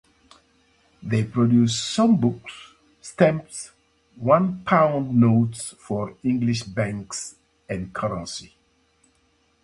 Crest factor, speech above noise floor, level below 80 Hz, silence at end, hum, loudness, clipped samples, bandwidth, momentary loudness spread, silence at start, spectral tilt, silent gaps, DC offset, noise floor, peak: 20 dB; 43 dB; -54 dBFS; 1.2 s; none; -22 LUFS; under 0.1%; 11.5 kHz; 18 LU; 1 s; -6 dB/octave; none; under 0.1%; -64 dBFS; -2 dBFS